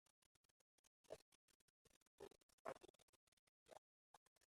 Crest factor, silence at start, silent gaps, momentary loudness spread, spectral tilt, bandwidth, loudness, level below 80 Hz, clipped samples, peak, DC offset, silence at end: 34 dB; 0.85 s; 0.87-1.04 s, 1.22-1.48 s, 1.55-1.85 s, 1.96-2.18 s, 2.43-2.65 s, 2.90-2.94 s, 3.02-3.66 s, 3.78-4.41 s; 8 LU; -3.5 dB/octave; 13.5 kHz; -62 LUFS; under -90 dBFS; under 0.1%; -34 dBFS; under 0.1%; 0.05 s